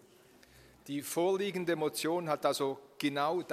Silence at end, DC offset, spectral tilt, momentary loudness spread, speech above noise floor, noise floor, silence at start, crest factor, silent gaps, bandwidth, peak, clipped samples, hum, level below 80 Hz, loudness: 0 s; under 0.1%; -4.5 dB/octave; 5 LU; 28 dB; -61 dBFS; 0.85 s; 20 dB; none; 15.5 kHz; -16 dBFS; under 0.1%; none; -76 dBFS; -33 LUFS